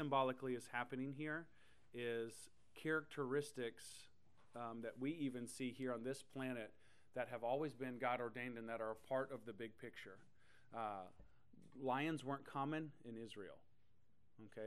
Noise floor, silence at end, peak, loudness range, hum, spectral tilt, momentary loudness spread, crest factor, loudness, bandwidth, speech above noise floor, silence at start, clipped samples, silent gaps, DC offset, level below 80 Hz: -80 dBFS; 0 s; -26 dBFS; 3 LU; none; -5.5 dB/octave; 15 LU; 20 dB; -47 LUFS; 13 kHz; 34 dB; 0 s; under 0.1%; none; under 0.1%; -82 dBFS